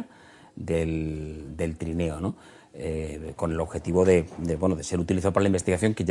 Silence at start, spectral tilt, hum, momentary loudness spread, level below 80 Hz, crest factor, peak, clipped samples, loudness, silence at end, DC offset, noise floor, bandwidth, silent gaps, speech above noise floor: 0 s; -6.5 dB/octave; none; 13 LU; -46 dBFS; 20 dB; -6 dBFS; under 0.1%; -27 LUFS; 0 s; under 0.1%; -52 dBFS; 11.5 kHz; none; 26 dB